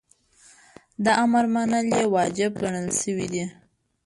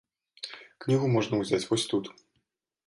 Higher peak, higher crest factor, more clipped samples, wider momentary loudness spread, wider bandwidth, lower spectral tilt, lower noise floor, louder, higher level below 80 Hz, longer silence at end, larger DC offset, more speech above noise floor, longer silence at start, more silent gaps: first, -8 dBFS vs -12 dBFS; about the same, 18 dB vs 18 dB; neither; second, 10 LU vs 16 LU; about the same, 11.5 kHz vs 11.5 kHz; about the same, -4.5 dB/octave vs -5.5 dB/octave; second, -56 dBFS vs -78 dBFS; first, -23 LUFS vs -28 LUFS; first, -60 dBFS vs -66 dBFS; second, 0.55 s vs 0.75 s; neither; second, 34 dB vs 50 dB; first, 1 s vs 0.45 s; neither